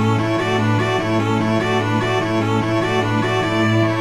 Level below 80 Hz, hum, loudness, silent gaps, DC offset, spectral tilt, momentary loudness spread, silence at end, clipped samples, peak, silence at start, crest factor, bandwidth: -46 dBFS; none; -18 LUFS; none; under 0.1%; -6.5 dB/octave; 2 LU; 0 s; under 0.1%; -6 dBFS; 0 s; 12 dB; 12.5 kHz